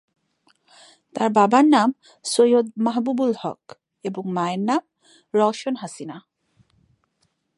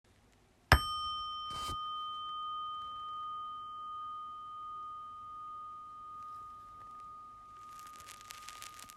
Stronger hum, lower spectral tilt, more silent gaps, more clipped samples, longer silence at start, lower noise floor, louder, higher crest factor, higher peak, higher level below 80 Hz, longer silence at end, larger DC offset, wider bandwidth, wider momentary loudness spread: neither; first, -5 dB/octave vs -3.5 dB/octave; neither; neither; first, 1.15 s vs 0.25 s; first, -70 dBFS vs -66 dBFS; first, -21 LUFS vs -39 LUFS; second, 20 dB vs 34 dB; first, -4 dBFS vs -8 dBFS; second, -76 dBFS vs -50 dBFS; first, 1.4 s vs 0 s; neither; second, 11.5 kHz vs 16 kHz; first, 18 LU vs 14 LU